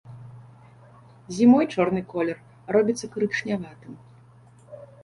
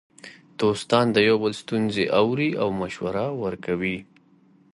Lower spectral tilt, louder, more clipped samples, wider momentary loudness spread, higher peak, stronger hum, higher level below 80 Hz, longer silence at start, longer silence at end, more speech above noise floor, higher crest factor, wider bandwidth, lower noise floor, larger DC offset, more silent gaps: about the same, -6 dB/octave vs -6 dB/octave; about the same, -23 LUFS vs -23 LUFS; neither; first, 27 LU vs 9 LU; about the same, -6 dBFS vs -4 dBFS; neither; about the same, -62 dBFS vs -58 dBFS; second, 0.05 s vs 0.25 s; second, 0.2 s vs 0.7 s; second, 29 dB vs 34 dB; about the same, 20 dB vs 20 dB; about the same, 11 kHz vs 11.5 kHz; second, -52 dBFS vs -57 dBFS; neither; neither